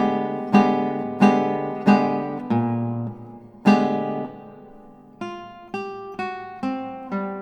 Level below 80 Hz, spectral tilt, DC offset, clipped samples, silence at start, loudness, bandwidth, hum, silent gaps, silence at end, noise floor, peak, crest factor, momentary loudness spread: -62 dBFS; -7.5 dB/octave; under 0.1%; under 0.1%; 0 s; -22 LUFS; 8.4 kHz; none; none; 0 s; -46 dBFS; -4 dBFS; 20 dB; 17 LU